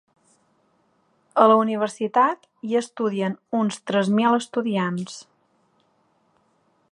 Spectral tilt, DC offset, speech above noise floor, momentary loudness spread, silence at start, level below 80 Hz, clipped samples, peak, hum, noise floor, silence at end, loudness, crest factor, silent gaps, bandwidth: -6 dB/octave; under 0.1%; 44 dB; 11 LU; 1.35 s; -76 dBFS; under 0.1%; -2 dBFS; none; -65 dBFS; 1.7 s; -22 LUFS; 22 dB; none; 11 kHz